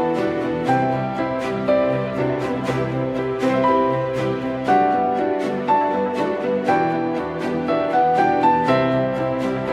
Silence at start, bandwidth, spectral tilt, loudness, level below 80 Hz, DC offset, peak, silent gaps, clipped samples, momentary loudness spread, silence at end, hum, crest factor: 0 s; 12 kHz; -7.5 dB/octave; -20 LUFS; -50 dBFS; under 0.1%; -4 dBFS; none; under 0.1%; 6 LU; 0 s; none; 14 dB